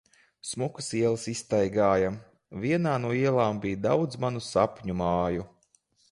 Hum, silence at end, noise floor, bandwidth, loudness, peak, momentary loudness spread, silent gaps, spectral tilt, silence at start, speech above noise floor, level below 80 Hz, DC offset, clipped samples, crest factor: none; 0.65 s; -67 dBFS; 11.5 kHz; -28 LUFS; -10 dBFS; 11 LU; none; -6 dB/octave; 0.45 s; 40 dB; -54 dBFS; under 0.1%; under 0.1%; 18 dB